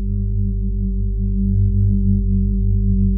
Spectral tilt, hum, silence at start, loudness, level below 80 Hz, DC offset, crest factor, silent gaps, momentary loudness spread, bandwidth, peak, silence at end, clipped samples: -19 dB/octave; 50 Hz at -30 dBFS; 0 s; -19 LUFS; -20 dBFS; under 0.1%; 10 dB; none; 5 LU; 0.4 kHz; -6 dBFS; 0 s; under 0.1%